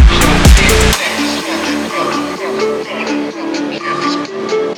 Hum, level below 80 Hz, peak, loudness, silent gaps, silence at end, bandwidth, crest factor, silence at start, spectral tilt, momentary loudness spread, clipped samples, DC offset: none; -16 dBFS; 0 dBFS; -13 LUFS; none; 0 s; 19 kHz; 12 dB; 0 s; -4.5 dB/octave; 11 LU; 0.5%; under 0.1%